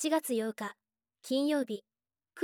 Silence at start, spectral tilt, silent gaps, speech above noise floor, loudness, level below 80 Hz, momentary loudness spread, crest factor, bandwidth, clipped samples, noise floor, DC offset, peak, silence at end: 0 s; -3.5 dB/octave; none; 29 dB; -33 LUFS; -88 dBFS; 12 LU; 16 dB; 17 kHz; under 0.1%; -61 dBFS; under 0.1%; -18 dBFS; 0 s